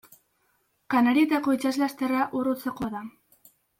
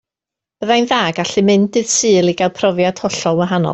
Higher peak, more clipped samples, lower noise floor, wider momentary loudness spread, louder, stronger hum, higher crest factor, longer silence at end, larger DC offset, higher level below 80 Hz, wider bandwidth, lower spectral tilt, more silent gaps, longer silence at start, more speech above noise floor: second, -10 dBFS vs -2 dBFS; neither; second, -70 dBFS vs -86 dBFS; first, 12 LU vs 4 LU; second, -25 LUFS vs -15 LUFS; neither; first, 18 dB vs 12 dB; first, 0.7 s vs 0 s; neither; second, -64 dBFS vs -56 dBFS; first, 16.5 kHz vs 8.4 kHz; about the same, -5 dB/octave vs -4 dB/octave; neither; first, 0.9 s vs 0.6 s; second, 46 dB vs 72 dB